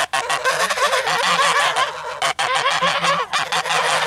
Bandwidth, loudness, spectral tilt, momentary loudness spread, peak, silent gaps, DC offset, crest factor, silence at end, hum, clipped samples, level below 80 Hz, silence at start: 17 kHz; -18 LUFS; -0.5 dB/octave; 5 LU; -4 dBFS; none; under 0.1%; 14 dB; 0 s; none; under 0.1%; -60 dBFS; 0 s